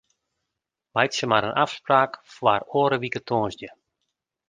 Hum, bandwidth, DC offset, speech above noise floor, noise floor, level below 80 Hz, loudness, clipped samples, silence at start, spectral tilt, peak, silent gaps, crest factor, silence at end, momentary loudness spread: none; 9.8 kHz; under 0.1%; 61 dB; -84 dBFS; -62 dBFS; -23 LUFS; under 0.1%; 0.95 s; -4.5 dB/octave; -2 dBFS; none; 22 dB; 0.8 s; 8 LU